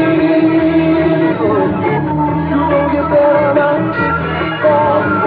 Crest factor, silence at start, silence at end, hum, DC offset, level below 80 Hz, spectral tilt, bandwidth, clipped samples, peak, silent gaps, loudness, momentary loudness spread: 12 dB; 0 s; 0 s; none; under 0.1%; -36 dBFS; -10.5 dB/octave; 4.9 kHz; under 0.1%; 0 dBFS; none; -13 LUFS; 4 LU